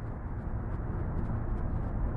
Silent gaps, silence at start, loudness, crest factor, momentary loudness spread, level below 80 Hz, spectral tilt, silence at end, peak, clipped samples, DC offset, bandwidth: none; 0 s; -36 LUFS; 14 dB; 4 LU; -36 dBFS; -11 dB/octave; 0 s; -20 dBFS; under 0.1%; under 0.1%; 3 kHz